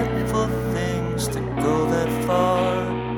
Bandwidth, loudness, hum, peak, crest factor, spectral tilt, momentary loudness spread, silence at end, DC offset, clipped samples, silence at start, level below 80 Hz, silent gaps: 18 kHz; -22 LUFS; none; -8 dBFS; 14 dB; -6 dB/octave; 5 LU; 0 s; under 0.1%; under 0.1%; 0 s; -38 dBFS; none